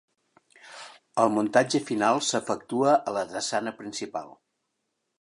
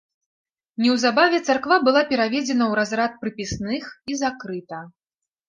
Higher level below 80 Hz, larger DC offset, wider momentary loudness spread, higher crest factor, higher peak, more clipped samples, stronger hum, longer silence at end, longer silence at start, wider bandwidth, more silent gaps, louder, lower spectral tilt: second, -74 dBFS vs -54 dBFS; neither; about the same, 17 LU vs 15 LU; about the same, 22 dB vs 20 dB; about the same, -6 dBFS vs -4 dBFS; neither; neither; first, 0.9 s vs 0.6 s; second, 0.65 s vs 0.8 s; first, 11.5 kHz vs 9.6 kHz; neither; second, -26 LUFS vs -21 LUFS; about the same, -3.5 dB/octave vs -4 dB/octave